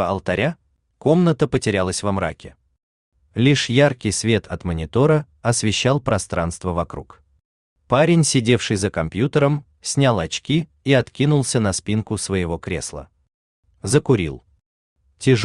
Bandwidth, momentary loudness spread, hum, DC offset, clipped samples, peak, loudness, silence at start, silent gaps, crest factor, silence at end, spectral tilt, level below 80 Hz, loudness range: 12.5 kHz; 10 LU; none; under 0.1%; under 0.1%; -2 dBFS; -20 LUFS; 0 s; 2.83-3.12 s, 7.45-7.76 s, 13.34-13.63 s, 14.66-14.96 s; 18 dB; 0 s; -5 dB/octave; -46 dBFS; 3 LU